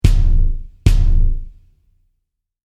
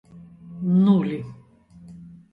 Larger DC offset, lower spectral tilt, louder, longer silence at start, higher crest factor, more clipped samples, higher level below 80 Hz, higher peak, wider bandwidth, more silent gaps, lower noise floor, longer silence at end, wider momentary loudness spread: neither; second, -6.5 dB/octave vs -10.5 dB/octave; about the same, -19 LUFS vs -21 LUFS; about the same, 0.05 s vs 0.15 s; about the same, 14 dB vs 18 dB; neither; first, -16 dBFS vs -60 dBFS; first, 0 dBFS vs -6 dBFS; first, 8.8 kHz vs 4.2 kHz; neither; first, -73 dBFS vs -50 dBFS; first, 1.2 s vs 0.25 s; second, 8 LU vs 26 LU